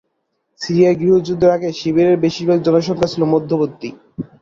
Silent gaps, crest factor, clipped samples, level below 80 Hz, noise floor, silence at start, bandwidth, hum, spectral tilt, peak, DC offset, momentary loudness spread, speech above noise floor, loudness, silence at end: none; 14 dB; under 0.1%; -52 dBFS; -70 dBFS; 0.6 s; 7.4 kHz; none; -7 dB/octave; -2 dBFS; under 0.1%; 16 LU; 55 dB; -15 LUFS; 0.15 s